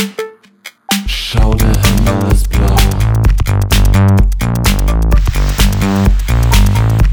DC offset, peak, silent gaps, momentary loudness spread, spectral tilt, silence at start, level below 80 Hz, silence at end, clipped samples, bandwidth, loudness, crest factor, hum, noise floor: under 0.1%; 0 dBFS; none; 5 LU; -5.5 dB/octave; 0 s; -12 dBFS; 0 s; under 0.1%; 19 kHz; -12 LUFS; 10 dB; none; -37 dBFS